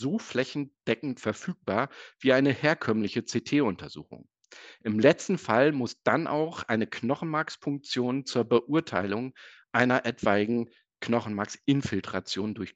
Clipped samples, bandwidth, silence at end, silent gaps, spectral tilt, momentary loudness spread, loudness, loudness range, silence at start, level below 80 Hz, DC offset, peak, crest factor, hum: under 0.1%; 8.4 kHz; 0.05 s; none; -5.5 dB/octave; 10 LU; -28 LUFS; 2 LU; 0 s; -68 dBFS; under 0.1%; -4 dBFS; 24 dB; none